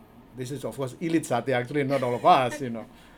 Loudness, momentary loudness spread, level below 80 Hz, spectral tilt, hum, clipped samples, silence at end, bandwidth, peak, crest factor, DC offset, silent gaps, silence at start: -26 LUFS; 15 LU; -60 dBFS; -5.5 dB/octave; none; under 0.1%; 0.3 s; 18.5 kHz; -6 dBFS; 20 dB; under 0.1%; none; 0.2 s